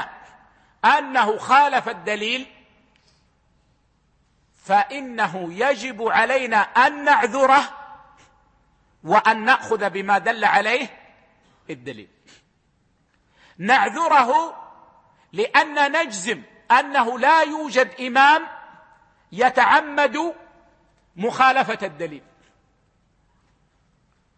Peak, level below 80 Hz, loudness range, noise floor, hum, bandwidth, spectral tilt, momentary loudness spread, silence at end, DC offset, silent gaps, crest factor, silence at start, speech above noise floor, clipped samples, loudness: -2 dBFS; -66 dBFS; 7 LU; -64 dBFS; none; 8.8 kHz; -3 dB/octave; 15 LU; 2.2 s; under 0.1%; none; 20 dB; 0 s; 45 dB; under 0.1%; -19 LUFS